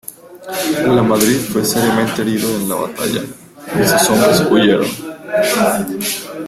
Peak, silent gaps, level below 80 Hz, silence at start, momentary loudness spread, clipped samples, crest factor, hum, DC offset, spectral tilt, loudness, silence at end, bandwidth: 0 dBFS; none; -48 dBFS; 0.1 s; 12 LU; under 0.1%; 14 dB; none; under 0.1%; -4 dB/octave; -15 LUFS; 0 s; 16 kHz